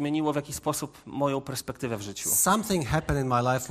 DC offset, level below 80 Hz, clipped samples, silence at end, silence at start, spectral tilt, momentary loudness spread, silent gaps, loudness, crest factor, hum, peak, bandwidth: under 0.1%; -46 dBFS; under 0.1%; 0 s; 0 s; -4.5 dB/octave; 11 LU; none; -27 LUFS; 18 dB; none; -10 dBFS; 15 kHz